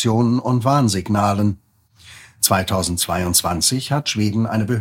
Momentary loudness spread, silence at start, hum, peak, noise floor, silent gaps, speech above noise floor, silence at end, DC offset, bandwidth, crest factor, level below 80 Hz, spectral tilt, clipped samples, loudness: 4 LU; 0 s; none; 0 dBFS; -47 dBFS; none; 29 dB; 0 s; under 0.1%; 17 kHz; 18 dB; -44 dBFS; -4.5 dB/octave; under 0.1%; -18 LUFS